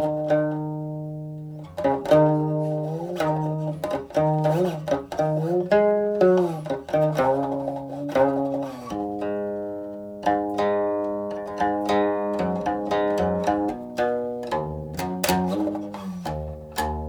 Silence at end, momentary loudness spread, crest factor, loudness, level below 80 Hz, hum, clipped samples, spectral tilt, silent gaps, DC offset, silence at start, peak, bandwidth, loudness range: 0 s; 12 LU; 18 dB; -24 LUFS; -48 dBFS; none; under 0.1%; -6.5 dB/octave; none; under 0.1%; 0 s; -6 dBFS; over 20 kHz; 4 LU